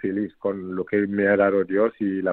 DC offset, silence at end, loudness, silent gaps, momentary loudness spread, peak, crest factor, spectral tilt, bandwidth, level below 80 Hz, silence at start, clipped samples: under 0.1%; 0 s; -23 LUFS; none; 9 LU; -6 dBFS; 16 dB; -11 dB/octave; 4.2 kHz; -64 dBFS; 0.05 s; under 0.1%